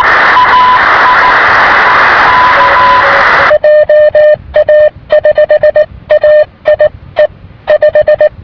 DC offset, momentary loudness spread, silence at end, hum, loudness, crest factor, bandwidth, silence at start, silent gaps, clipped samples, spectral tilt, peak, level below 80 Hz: under 0.1%; 6 LU; 0.15 s; none; -5 LUFS; 6 dB; 5.4 kHz; 0 s; none; 6%; -4.5 dB/octave; 0 dBFS; -34 dBFS